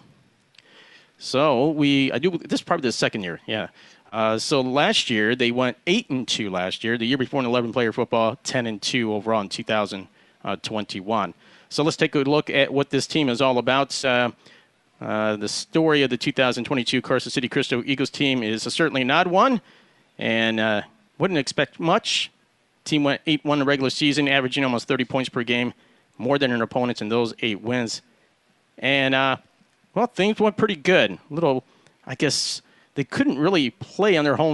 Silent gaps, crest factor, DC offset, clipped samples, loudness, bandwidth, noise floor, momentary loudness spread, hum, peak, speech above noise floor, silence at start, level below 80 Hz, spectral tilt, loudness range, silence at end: none; 20 dB; under 0.1%; under 0.1%; -22 LUFS; 11.5 kHz; -64 dBFS; 9 LU; none; -4 dBFS; 41 dB; 1.2 s; -64 dBFS; -4.5 dB/octave; 3 LU; 0 s